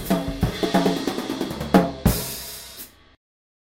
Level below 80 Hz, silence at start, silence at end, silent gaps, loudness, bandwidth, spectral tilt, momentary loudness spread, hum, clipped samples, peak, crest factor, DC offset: -36 dBFS; 0 s; 0.9 s; none; -23 LUFS; 16.5 kHz; -5.5 dB/octave; 16 LU; none; under 0.1%; 0 dBFS; 24 dB; under 0.1%